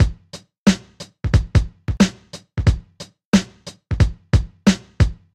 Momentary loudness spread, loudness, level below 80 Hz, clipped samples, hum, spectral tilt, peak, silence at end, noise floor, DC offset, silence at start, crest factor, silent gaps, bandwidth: 21 LU; -20 LUFS; -26 dBFS; under 0.1%; none; -6 dB/octave; -4 dBFS; 0.2 s; -42 dBFS; under 0.1%; 0 s; 16 dB; 0.58-0.66 s, 3.25-3.32 s; 12.5 kHz